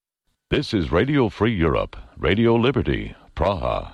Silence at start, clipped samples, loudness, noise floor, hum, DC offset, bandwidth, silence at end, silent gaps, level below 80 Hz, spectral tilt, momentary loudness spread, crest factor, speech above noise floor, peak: 0.5 s; under 0.1%; -21 LUFS; -74 dBFS; none; under 0.1%; 10.5 kHz; 0 s; none; -36 dBFS; -7.5 dB/octave; 8 LU; 14 dB; 53 dB; -8 dBFS